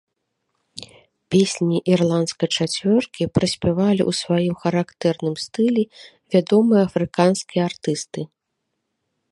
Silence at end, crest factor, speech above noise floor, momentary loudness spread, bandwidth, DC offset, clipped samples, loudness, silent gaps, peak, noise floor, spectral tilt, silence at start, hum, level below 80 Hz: 1.05 s; 18 dB; 57 dB; 10 LU; 11.5 kHz; under 0.1%; under 0.1%; -20 LUFS; none; -2 dBFS; -77 dBFS; -5.5 dB/octave; 0.75 s; none; -52 dBFS